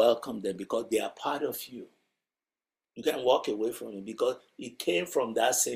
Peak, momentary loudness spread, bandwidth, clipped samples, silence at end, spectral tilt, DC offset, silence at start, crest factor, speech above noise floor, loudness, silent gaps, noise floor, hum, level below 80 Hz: -10 dBFS; 14 LU; 16 kHz; under 0.1%; 0 s; -2.5 dB/octave; under 0.1%; 0 s; 20 dB; over 60 dB; -30 LUFS; none; under -90 dBFS; none; -74 dBFS